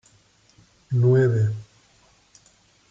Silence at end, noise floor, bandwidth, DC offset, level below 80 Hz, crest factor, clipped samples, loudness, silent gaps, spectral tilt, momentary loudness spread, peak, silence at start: 1.25 s; -59 dBFS; 7.6 kHz; under 0.1%; -62 dBFS; 14 dB; under 0.1%; -21 LUFS; none; -9 dB/octave; 10 LU; -10 dBFS; 0.9 s